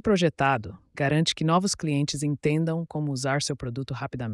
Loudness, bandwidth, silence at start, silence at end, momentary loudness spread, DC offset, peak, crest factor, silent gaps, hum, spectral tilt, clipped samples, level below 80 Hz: -26 LUFS; 12 kHz; 0.05 s; 0 s; 9 LU; under 0.1%; -10 dBFS; 16 dB; none; none; -5 dB/octave; under 0.1%; -54 dBFS